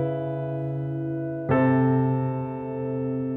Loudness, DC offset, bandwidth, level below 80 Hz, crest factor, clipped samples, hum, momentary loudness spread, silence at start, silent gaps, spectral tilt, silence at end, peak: -26 LUFS; under 0.1%; 3.8 kHz; -58 dBFS; 16 dB; under 0.1%; none; 9 LU; 0 s; none; -11.5 dB/octave; 0 s; -10 dBFS